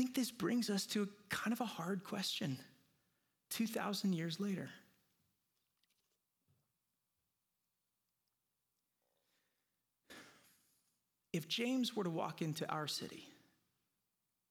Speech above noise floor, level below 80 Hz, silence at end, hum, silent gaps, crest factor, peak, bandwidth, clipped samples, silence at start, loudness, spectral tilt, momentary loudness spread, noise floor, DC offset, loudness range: 48 dB; -86 dBFS; 1.2 s; none; none; 20 dB; -24 dBFS; 19 kHz; under 0.1%; 0 s; -40 LUFS; -4.5 dB/octave; 13 LU; -88 dBFS; under 0.1%; 7 LU